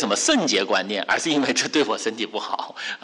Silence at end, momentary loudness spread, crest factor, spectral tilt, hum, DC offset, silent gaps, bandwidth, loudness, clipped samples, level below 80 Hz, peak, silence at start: 0.05 s; 9 LU; 14 dB; -2 dB/octave; none; under 0.1%; none; 11.5 kHz; -22 LUFS; under 0.1%; -68 dBFS; -10 dBFS; 0 s